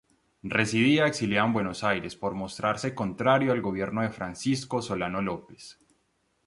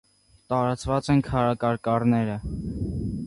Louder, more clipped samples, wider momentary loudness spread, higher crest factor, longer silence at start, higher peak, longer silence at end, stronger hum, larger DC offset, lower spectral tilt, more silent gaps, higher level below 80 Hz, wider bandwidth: about the same, -27 LUFS vs -25 LUFS; neither; about the same, 10 LU vs 8 LU; about the same, 20 dB vs 16 dB; about the same, 0.45 s vs 0.5 s; about the same, -8 dBFS vs -8 dBFS; first, 0.75 s vs 0 s; neither; neither; second, -5.5 dB/octave vs -7.5 dB/octave; neither; second, -58 dBFS vs -42 dBFS; about the same, 11.5 kHz vs 11.5 kHz